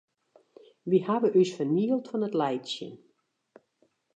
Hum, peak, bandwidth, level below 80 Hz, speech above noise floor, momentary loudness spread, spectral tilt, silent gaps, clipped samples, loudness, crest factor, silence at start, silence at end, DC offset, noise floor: none; -12 dBFS; 8.4 kHz; -84 dBFS; 45 dB; 13 LU; -6.5 dB/octave; none; under 0.1%; -27 LUFS; 18 dB; 0.85 s; 1.2 s; under 0.1%; -71 dBFS